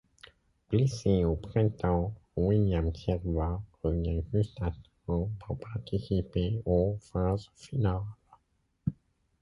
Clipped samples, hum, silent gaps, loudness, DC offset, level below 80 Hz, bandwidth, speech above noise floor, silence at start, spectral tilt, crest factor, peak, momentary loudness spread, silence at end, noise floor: under 0.1%; none; none; -31 LUFS; under 0.1%; -40 dBFS; 11 kHz; 44 dB; 0.7 s; -8.5 dB/octave; 18 dB; -14 dBFS; 10 LU; 0.5 s; -73 dBFS